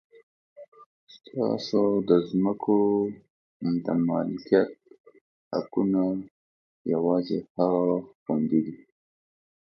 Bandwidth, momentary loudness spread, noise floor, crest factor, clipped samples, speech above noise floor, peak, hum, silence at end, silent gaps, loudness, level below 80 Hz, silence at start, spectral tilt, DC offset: 6.6 kHz; 10 LU; under -90 dBFS; 20 dB; under 0.1%; over 65 dB; -6 dBFS; none; 0.9 s; 0.68-0.72 s, 0.86-1.07 s, 3.30-3.60 s, 5.00-5.04 s, 5.21-5.51 s, 6.31-6.85 s, 7.50-7.55 s, 8.15-8.26 s; -26 LUFS; -66 dBFS; 0.6 s; -8.5 dB/octave; under 0.1%